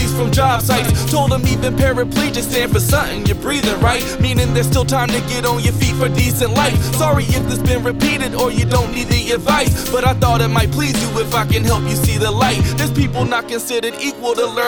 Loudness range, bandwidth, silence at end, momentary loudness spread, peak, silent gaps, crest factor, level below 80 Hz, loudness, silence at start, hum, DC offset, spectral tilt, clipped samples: 1 LU; 18 kHz; 0 s; 3 LU; 0 dBFS; none; 14 dB; -26 dBFS; -16 LUFS; 0 s; none; under 0.1%; -5 dB/octave; under 0.1%